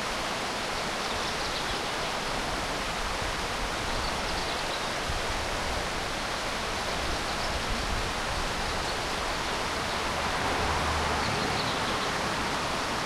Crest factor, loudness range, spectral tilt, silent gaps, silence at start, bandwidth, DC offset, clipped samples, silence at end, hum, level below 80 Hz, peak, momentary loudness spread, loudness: 14 dB; 2 LU; -3 dB/octave; none; 0 s; 16.5 kHz; under 0.1%; under 0.1%; 0 s; none; -40 dBFS; -16 dBFS; 3 LU; -29 LUFS